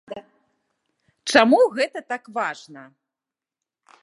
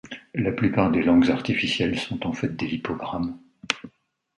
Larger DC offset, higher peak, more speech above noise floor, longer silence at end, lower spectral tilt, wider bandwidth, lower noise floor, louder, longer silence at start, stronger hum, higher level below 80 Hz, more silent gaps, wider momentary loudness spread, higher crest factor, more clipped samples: neither; about the same, 0 dBFS vs -2 dBFS; first, 69 dB vs 37 dB; first, 1.2 s vs 0.5 s; second, -3 dB/octave vs -6 dB/octave; about the same, 11.5 kHz vs 11 kHz; first, -89 dBFS vs -60 dBFS; first, -20 LUFS vs -24 LUFS; about the same, 0.1 s vs 0.05 s; neither; second, -70 dBFS vs -50 dBFS; neither; first, 23 LU vs 11 LU; about the same, 24 dB vs 22 dB; neither